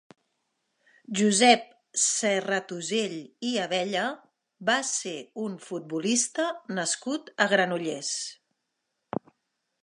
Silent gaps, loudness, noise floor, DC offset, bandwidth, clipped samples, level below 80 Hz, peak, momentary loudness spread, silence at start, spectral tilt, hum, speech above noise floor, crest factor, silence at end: none; -27 LUFS; -80 dBFS; under 0.1%; 11.5 kHz; under 0.1%; -80 dBFS; -4 dBFS; 13 LU; 1.1 s; -2.5 dB/octave; none; 54 dB; 24 dB; 1.5 s